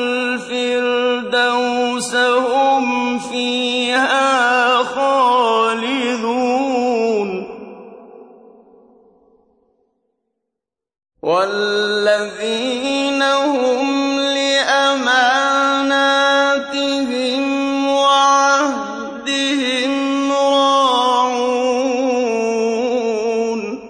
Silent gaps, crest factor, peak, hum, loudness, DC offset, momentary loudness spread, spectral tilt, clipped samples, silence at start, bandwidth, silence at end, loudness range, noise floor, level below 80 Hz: none; 14 dB; -2 dBFS; none; -16 LUFS; under 0.1%; 6 LU; -2.5 dB/octave; under 0.1%; 0 s; 10.5 kHz; 0 s; 7 LU; -82 dBFS; -62 dBFS